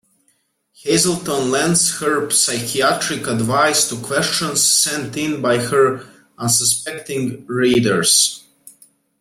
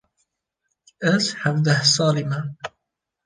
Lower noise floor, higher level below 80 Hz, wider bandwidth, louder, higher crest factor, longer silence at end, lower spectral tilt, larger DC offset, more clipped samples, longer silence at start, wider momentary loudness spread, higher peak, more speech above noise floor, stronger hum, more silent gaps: second, -64 dBFS vs -81 dBFS; first, -56 dBFS vs -64 dBFS; first, 16.5 kHz vs 10 kHz; first, -16 LUFS vs -20 LUFS; about the same, 18 dB vs 20 dB; about the same, 0.5 s vs 0.6 s; second, -2.5 dB/octave vs -4 dB/octave; neither; neither; second, 0.85 s vs 1 s; second, 10 LU vs 16 LU; about the same, -2 dBFS vs -4 dBFS; second, 46 dB vs 60 dB; neither; neither